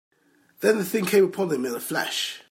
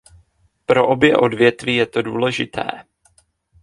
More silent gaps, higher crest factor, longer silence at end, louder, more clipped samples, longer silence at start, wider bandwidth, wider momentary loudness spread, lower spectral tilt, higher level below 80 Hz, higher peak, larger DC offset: neither; about the same, 16 dB vs 18 dB; second, 0.1 s vs 0.8 s; second, -24 LUFS vs -17 LUFS; neither; about the same, 0.6 s vs 0.7 s; first, 16.5 kHz vs 11.5 kHz; second, 7 LU vs 13 LU; second, -4 dB/octave vs -5.5 dB/octave; second, -74 dBFS vs -54 dBFS; second, -8 dBFS vs 0 dBFS; neither